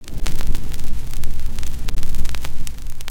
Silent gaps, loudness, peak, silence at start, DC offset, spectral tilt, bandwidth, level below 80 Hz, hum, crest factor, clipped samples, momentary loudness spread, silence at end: none; -30 LUFS; -2 dBFS; 0 s; under 0.1%; -4 dB/octave; 10.5 kHz; -20 dBFS; none; 10 dB; under 0.1%; 4 LU; 0 s